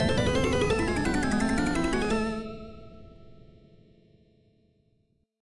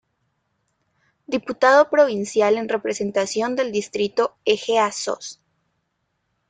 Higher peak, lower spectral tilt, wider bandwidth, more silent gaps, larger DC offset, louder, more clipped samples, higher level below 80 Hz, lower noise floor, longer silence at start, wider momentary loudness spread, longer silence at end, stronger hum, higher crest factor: second, -12 dBFS vs -2 dBFS; first, -5.5 dB/octave vs -3.5 dB/octave; first, 11.5 kHz vs 9.4 kHz; neither; neither; second, -27 LUFS vs -20 LUFS; neither; first, -42 dBFS vs -66 dBFS; about the same, -70 dBFS vs -73 dBFS; second, 0 s vs 1.3 s; first, 16 LU vs 12 LU; second, 0.2 s vs 1.15 s; neither; about the same, 16 dB vs 20 dB